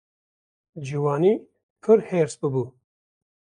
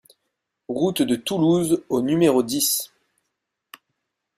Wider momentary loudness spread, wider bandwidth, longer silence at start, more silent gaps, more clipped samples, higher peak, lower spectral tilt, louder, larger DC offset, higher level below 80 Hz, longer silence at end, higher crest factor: first, 13 LU vs 6 LU; second, 10.5 kHz vs 16 kHz; about the same, 0.75 s vs 0.7 s; first, 1.63-1.76 s vs none; neither; about the same, -6 dBFS vs -6 dBFS; first, -7.5 dB/octave vs -4.5 dB/octave; about the same, -23 LUFS vs -21 LUFS; neither; second, -70 dBFS vs -62 dBFS; second, 0.75 s vs 1.5 s; about the same, 20 dB vs 18 dB